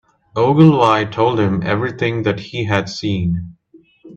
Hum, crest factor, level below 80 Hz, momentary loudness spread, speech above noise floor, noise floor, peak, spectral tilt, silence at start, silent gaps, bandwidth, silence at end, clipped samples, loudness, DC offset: none; 16 dB; -48 dBFS; 12 LU; 30 dB; -45 dBFS; 0 dBFS; -7.5 dB/octave; 0.35 s; none; 7.8 kHz; 0 s; under 0.1%; -16 LUFS; under 0.1%